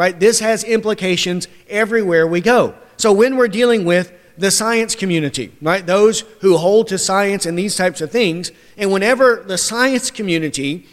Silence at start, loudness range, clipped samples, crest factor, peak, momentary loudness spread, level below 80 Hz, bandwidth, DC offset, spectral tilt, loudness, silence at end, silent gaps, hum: 0 s; 2 LU; under 0.1%; 14 dB; -2 dBFS; 8 LU; -54 dBFS; 15.5 kHz; under 0.1%; -3.5 dB/octave; -15 LUFS; 0.15 s; none; none